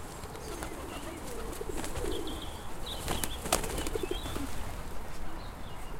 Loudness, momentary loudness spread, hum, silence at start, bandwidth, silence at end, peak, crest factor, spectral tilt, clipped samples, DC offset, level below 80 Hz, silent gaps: -38 LUFS; 12 LU; none; 0 s; 17 kHz; 0 s; -8 dBFS; 28 dB; -3.5 dB/octave; under 0.1%; under 0.1%; -42 dBFS; none